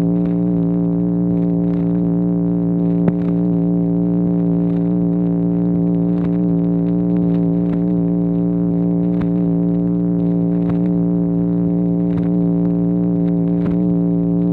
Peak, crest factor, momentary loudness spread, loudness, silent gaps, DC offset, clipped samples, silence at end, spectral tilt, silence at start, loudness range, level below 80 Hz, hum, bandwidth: -2 dBFS; 14 dB; 1 LU; -17 LUFS; none; under 0.1%; under 0.1%; 0 s; -13 dB/octave; 0 s; 0 LU; -40 dBFS; none; 2.4 kHz